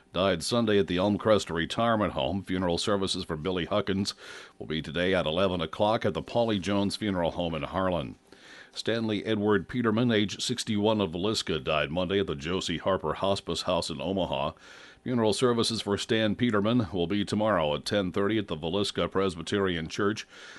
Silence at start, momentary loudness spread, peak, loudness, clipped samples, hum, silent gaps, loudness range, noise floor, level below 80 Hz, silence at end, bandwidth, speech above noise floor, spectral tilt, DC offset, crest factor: 0.15 s; 6 LU; -10 dBFS; -28 LUFS; under 0.1%; none; none; 3 LU; -51 dBFS; -54 dBFS; 0 s; 11.5 kHz; 23 dB; -5 dB/octave; under 0.1%; 18 dB